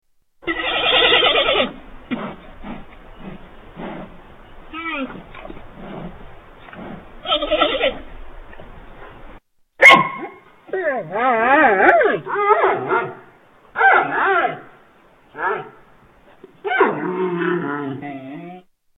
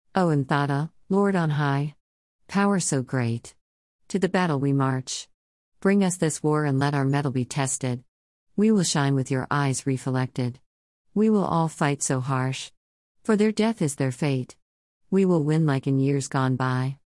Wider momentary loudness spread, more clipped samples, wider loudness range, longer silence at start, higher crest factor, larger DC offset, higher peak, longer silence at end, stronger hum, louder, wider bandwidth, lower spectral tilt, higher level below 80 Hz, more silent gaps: first, 24 LU vs 9 LU; neither; first, 18 LU vs 2 LU; first, 0.45 s vs 0.15 s; about the same, 20 dB vs 16 dB; neither; first, 0 dBFS vs -8 dBFS; first, 0.4 s vs 0.1 s; neither; first, -16 LUFS vs -24 LUFS; first, 17 kHz vs 12 kHz; second, -4 dB/octave vs -6 dB/octave; first, -44 dBFS vs -64 dBFS; second, none vs 2.00-2.39 s, 3.61-3.99 s, 5.34-5.72 s, 8.08-8.47 s, 10.66-11.05 s, 12.77-13.15 s, 14.62-15.01 s